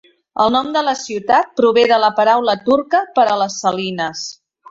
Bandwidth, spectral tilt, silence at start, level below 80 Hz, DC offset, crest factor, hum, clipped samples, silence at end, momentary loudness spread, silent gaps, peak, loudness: 7.8 kHz; -3.5 dB/octave; 0.35 s; -58 dBFS; under 0.1%; 16 dB; none; under 0.1%; 0.4 s; 9 LU; none; 0 dBFS; -15 LUFS